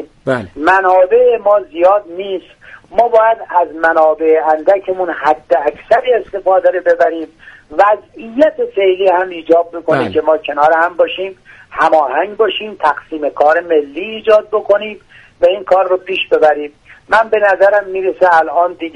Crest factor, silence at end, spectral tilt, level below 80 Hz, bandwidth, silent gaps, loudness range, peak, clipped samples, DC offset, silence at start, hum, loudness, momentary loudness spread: 12 dB; 0.05 s; -5.5 dB/octave; -52 dBFS; 9.8 kHz; none; 2 LU; 0 dBFS; under 0.1%; under 0.1%; 0 s; none; -13 LUFS; 9 LU